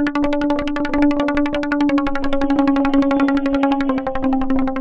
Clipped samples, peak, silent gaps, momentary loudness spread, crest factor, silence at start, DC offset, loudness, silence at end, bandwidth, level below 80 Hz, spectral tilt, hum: under 0.1%; -4 dBFS; none; 4 LU; 14 dB; 0 s; under 0.1%; -18 LUFS; 0 s; 7.2 kHz; -32 dBFS; -6.5 dB/octave; none